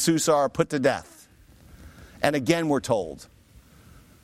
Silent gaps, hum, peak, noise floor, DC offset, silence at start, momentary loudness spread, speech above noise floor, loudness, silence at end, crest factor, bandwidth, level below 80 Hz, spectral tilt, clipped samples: none; none; -4 dBFS; -53 dBFS; under 0.1%; 0 s; 11 LU; 29 dB; -24 LUFS; 1 s; 22 dB; 16 kHz; -54 dBFS; -4.5 dB/octave; under 0.1%